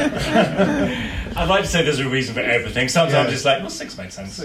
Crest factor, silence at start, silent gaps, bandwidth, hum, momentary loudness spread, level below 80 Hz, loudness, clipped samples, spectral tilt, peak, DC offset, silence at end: 14 dB; 0 s; none; 15.5 kHz; none; 12 LU; -36 dBFS; -19 LUFS; under 0.1%; -4.5 dB/octave; -6 dBFS; under 0.1%; 0 s